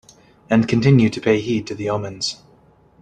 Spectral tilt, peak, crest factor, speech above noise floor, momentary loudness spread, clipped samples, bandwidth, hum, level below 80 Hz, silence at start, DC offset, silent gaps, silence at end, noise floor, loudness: -6.5 dB/octave; -2 dBFS; 18 dB; 35 dB; 10 LU; under 0.1%; 9.6 kHz; none; -50 dBFS; 0.5 s; under 0.1%; none; 0.7 s; -53 dBFS; -19 LUFS